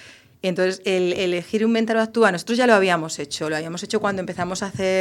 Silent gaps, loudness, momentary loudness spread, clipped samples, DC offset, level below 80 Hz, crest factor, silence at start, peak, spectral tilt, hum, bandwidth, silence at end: none; -21 LUFS; 9 LU; under 0.1%; under 0.1%; -60 dBFS; 20 dB; 0 s; -2 dBFS; -4.5 dB/octave; none; 14 kHz; 0 s